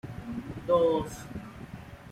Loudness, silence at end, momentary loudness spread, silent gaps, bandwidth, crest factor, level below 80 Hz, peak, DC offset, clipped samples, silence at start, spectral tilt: -29 LUFS; 0 s; 20 LU; none; 15 kHz; 18 dB; -52 dBFS; -12 dBFS; under 0.1%; under 0.1%; 0.05 s; -6.5 dB/octave